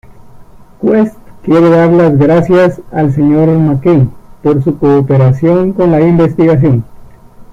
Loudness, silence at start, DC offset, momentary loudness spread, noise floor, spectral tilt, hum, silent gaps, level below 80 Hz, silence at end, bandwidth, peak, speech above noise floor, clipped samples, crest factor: -9 LUFS; 0.2 s; under 0.1%; 7 LU; -34 dBFS; -10 dB/octave; none; none; -38 dBFS; 0 s; 7.4 kHz; 0 dBFS; 26 dB; under 0.1%; 8 dB